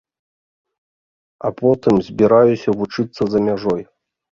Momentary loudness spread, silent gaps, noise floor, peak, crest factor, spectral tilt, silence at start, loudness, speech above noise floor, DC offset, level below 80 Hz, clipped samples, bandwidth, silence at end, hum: 11 LU; none; under -90 dBFS; -2 dBFS; 16 dB; -8 dB/octave; 1.45 s; -17 LUFS; over 74 dB; under 0.1%; -52 dBFS; under 0.1%; 7.2 kHz; 0.5 s; none